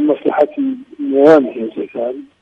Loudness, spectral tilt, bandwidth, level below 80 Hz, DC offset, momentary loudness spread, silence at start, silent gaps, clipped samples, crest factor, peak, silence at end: -15 LUFS; -7.5 dB/octave; 7.6 kHz; -62 dBFS; under 0.1%; 14 LU; 0 s; none; under 0.1%; 14 dB; 0 dBFS; 0.2 s